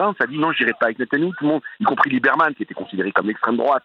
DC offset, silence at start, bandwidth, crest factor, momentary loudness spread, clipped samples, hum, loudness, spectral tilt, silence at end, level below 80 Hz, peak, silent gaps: under 0.1%; 0 s; 6.2 kHz; 18 dB; 5 LU; under 0.1%; none; -19 LUFS; -7.5 dB/octave; 0.05 s; -70 dBFS; -2 dBFS; none